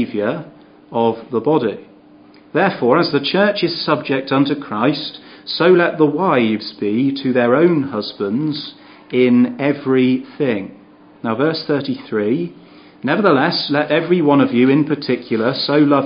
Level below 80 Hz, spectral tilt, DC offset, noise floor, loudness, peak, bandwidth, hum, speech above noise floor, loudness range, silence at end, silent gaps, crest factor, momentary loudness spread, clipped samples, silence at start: -64 dBFS; -11 dB/octave; under 0.1%; -45 dBFS; -17 LUFS; 0 dBFS; 5.4 kHz; none; 29 dB; 3 LU; 0 s; none; 16 dB; 10 LU; under 0.1%; 0 s